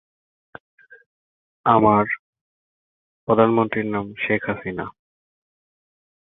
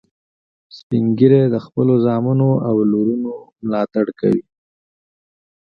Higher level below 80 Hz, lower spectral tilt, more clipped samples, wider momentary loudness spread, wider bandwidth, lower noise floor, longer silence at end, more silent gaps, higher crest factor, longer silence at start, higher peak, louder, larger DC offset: about the same, -56 dBFS vs -58 dBFS; about the same, -10.5 dB/octave vs -11 dB/octave; neither; first, 14 LU vs 10 LU; second, 4 kHz vs 5.8 kHz; about the same, under -90 dBFS vs under -90 dBFS; about the same, 1.3 s vs 1.25 s; first, 2.19-2.33 s, 2.41-3.27 s vs 0.83-0.90 s; about the same, 22 dB vs 18 dB; first, 1.65 s vs 0.75 s; about the same, 0 dBFS vs 0 dBFS; second, -20 LUFS vs -17 LUFS; neither